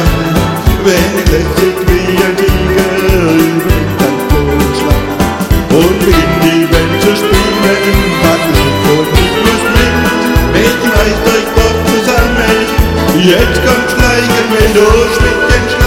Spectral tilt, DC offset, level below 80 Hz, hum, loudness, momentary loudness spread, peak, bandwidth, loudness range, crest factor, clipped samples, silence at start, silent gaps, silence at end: -5 dB/octave; under 0.1%; -16 dBFS; none; -9 LUFS; 3 LU; 0 dBFS; 17 kHz; 2 LU; 8 dB; 1%; 0 s; none; 0 s